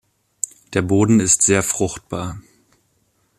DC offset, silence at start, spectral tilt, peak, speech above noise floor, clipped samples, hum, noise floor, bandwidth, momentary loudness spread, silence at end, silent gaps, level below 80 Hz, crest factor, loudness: under 0.1%; 0.45 s; -4.5 dB/octave; -2 dBFS; 47 dB; under 0.1%; none; -64 dBFS; 15 kHz; 14 LU; 1 s; none; -50 dBFS; 20 dB; -18 LUFS